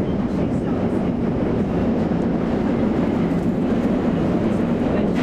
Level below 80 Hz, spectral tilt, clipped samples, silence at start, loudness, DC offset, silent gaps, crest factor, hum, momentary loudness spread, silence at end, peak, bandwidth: -36 dBFS; -9 dB/octave; under 0.1%; 0 s; -21 LUFS; under 0.1%; none; 10 dB; none; 2 LU; 0 s; -8 dBFS; 9 kHz